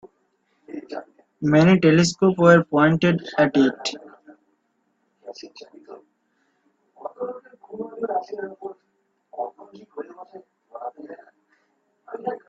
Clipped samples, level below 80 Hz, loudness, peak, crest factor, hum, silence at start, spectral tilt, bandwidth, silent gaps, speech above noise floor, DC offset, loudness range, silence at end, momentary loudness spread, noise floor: under 0.1%; -60 dBFS; -20 LUFS; -2 dBFS; 22 dB; none; 0.7 s; -6 dB/octave; 8 kHz; none; 53 dB; under 0.1%; 21 LU; 0.1 s; 26 LU; -70 dBFS